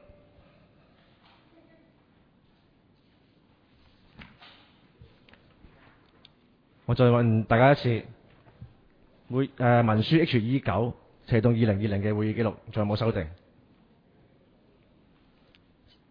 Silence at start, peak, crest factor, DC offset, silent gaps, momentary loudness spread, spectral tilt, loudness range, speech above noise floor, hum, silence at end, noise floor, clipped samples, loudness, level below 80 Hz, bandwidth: 4.2 s; -8 dBFS; 22 dB; under 0.1%; none; 12 LU; -10 dB/octave; 8 LU; 39 dB; none; 2.75 s; -63 dBFS; under 0.1%; -25 LUFS; -54 dBFS; 5.2 kHz